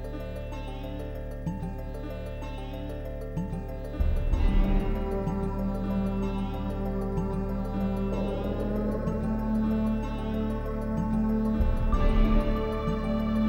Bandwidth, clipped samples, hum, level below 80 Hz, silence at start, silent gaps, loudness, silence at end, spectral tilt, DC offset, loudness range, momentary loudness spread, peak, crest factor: 6.8 kHz; under 0.1%; none; -30 dBFS; 0 s; none; -30 LUFS; 0 s; -8.5 dB/octave; under 0.1%; 8 LU; 10 LU; -12 dBFS; 16 dB